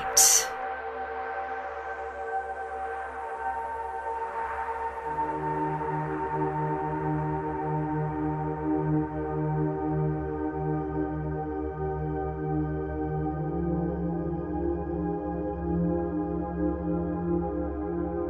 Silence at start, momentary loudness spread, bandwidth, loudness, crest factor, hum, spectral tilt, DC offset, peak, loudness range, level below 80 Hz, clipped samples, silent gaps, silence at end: 0 s; 5 LU; 13 kHz; -29 LUFS; 24 dB; none; -4.5 dB/octave; under 0.1%; -6 dBFS; 4 LU; -42 dBFS; under 0.1%; none; 0 s